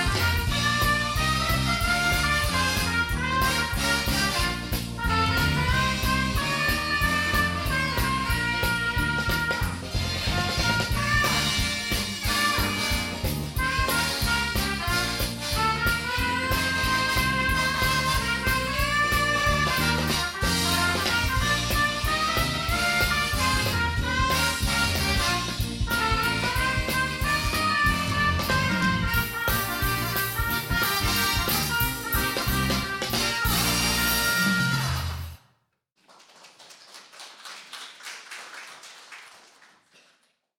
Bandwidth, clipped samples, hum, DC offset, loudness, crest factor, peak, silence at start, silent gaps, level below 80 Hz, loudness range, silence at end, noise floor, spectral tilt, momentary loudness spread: 17 kHz; under 0.1%; none; under 0.1%; -24 LUFS; 16 dB; -8 dBFS; 0 s; none; -34 dBFS; 3 LU; 1.3 s; -71 dBFS; -3.5 dB/octave; 6 LU